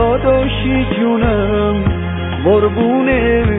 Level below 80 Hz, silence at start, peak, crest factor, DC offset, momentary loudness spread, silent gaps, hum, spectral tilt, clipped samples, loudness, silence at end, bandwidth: -24 dBFS; 0 s; -2 dBFS; 12 dB; under 0.1%; 4 LU; none; none; -10 dB/octave; under 0.1%; -14 LUFS; 0 s; 4 kHz